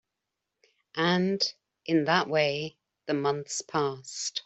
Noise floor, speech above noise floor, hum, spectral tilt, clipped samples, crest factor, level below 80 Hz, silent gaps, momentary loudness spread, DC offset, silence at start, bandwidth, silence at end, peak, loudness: -85 dBFS; 58 dB; none; -4 dB/octave; under 0.1%; 22 dB; -72 dBFS; none; 13 LU; under 0.1%; 0.95 s; 8.2 kHz; 0.05 s; -8 dBFS; -28 LUFS